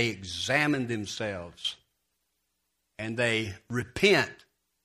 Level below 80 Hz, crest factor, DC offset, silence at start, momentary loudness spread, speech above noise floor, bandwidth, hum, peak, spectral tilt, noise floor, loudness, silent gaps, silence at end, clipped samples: -60 dBFS; 22 dB; under 0.1%; 0 s; 12 LU; 50 dB; 15 kHz; none; -8 dBFS; -4 dB/octave; -79 dBFS; -28 LUFS; none; 0.5 s; under 0.1%